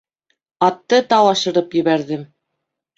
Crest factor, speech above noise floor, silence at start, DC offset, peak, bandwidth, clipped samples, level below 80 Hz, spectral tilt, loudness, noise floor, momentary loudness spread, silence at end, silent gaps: 18 dB; 62 dB; 0.6 s; under 0.1%; -2 dBFS; 7.8 kHz; under 0.1%; -66 dBFS; -4.5 dB/octave; -16 LUFS; -78 dBFS; 8 LU; 0.7 s; none